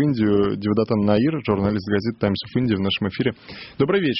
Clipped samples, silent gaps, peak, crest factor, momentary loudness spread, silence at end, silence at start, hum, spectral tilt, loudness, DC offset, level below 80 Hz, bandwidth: under 0.1%; none; -4 dBFS; 16 dB; 5 LU; 0 s; 0 s; none; -9.5 dB/octave; -21 LUFS; under 0.1%; -50 dBFS; 6 kHz